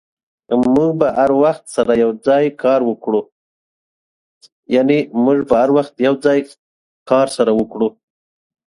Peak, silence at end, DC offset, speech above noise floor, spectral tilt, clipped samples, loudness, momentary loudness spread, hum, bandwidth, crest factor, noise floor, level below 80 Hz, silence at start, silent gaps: 0 dBFS; 0.85 s; under 0.1%; over 76 dB; -6.5 dB/octave; under 0.1%; -15 LUFS; 7 LU; none; 11.5 kHz; 16 dB; under -90 dBFS; -54 dBFS; 0.5 s; 3.32-4.41 s, 4.52-4.63 s, 6.59-7.06 s